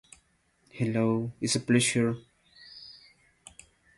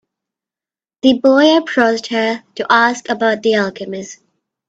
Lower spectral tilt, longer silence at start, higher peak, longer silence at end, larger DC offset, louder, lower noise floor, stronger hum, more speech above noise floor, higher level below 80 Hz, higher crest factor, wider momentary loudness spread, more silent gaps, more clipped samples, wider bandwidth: about the same, -4.5 dB/octave vs -4 dB/octave; second, 0.75 s vs 1.05 s; second, -12 dBFS vs 0 dBFS; first, 1.05 s vs 0.55 s; neither; second, -27 LUFS vs -14 LUFS; second, -68 dBFS vs under -90 dBFS; neither; second, 42 dB vs over 76 dB; about the same, -64 dBFS vs -60 dBFS; about the same, 20 dB vs 16 dB; first, 24 LU vs 15 LU; neither; neither; first, 11.5 kHz vs 8 kHz